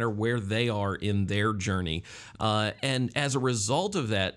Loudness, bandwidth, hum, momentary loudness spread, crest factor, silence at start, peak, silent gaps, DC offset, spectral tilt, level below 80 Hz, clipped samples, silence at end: -28 LUFS; 12 kHz; none; 4 LU; 16 dB; 0 s; -12 dBFS; none; under 0.1%; -4.5 dB/octave; -58 dBFS; under 0.1%; 0.05 s